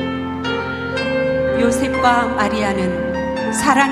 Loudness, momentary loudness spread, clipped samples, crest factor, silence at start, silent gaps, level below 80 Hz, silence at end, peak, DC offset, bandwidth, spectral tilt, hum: -18 LUFS; 7 LU; under 0.1%; 18 dB; 0 s; none; -40 dBFS; 0 s; 0 dBFS; under 0.1%; 15 kHz; -4.5 dB/octave; none